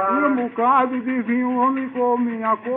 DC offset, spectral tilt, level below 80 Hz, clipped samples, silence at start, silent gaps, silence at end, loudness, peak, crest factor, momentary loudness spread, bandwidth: under 0.1%; -4.5 dB/octave; -72 dBFS; under 0.1%; 0 s; none; 0 s; -20 LUFS; -6 dBFS; 14 dB; 5 LU; 3.8 kHz